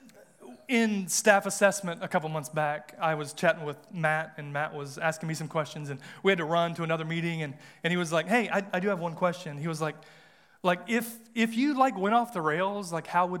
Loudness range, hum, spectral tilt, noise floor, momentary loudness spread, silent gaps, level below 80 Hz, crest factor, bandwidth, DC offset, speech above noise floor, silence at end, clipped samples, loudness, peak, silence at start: 3 LU; none; -4.5 dB/octave; -52 dBFS; 10 LU; none; -82 dBFS; 24 dB; 17.5 kHz; under 0.1%; 23 dB; 0 s; under 0.1%; -29 LUFS; -6 dBFS; 0.4 s